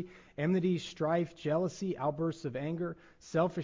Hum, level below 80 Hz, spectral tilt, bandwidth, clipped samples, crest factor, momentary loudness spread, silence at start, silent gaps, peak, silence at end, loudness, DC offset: none; -66 dBFS; -7 dB/octave; 7.6 kHz; under 0.1%; 16 dB; 7 LU; 0 s; none; -18 dBFS; 0 s; -34 LUFS; under 0.1%